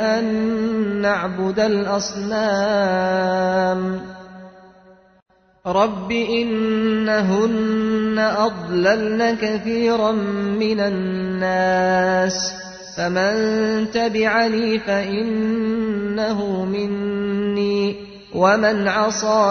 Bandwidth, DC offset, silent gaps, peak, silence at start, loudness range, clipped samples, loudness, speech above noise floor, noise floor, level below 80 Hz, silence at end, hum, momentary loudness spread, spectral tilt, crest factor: 6.6 kHz; under 0.1%; 5.22-5.26 s; -2 dBFS; 0 s; 3 LU; under 0.1%; -19 LUFS; 31 dB; -50 dBFS; -52 dBFS; 0 s; none; 6 LU; -5 dB/octave; 16 dB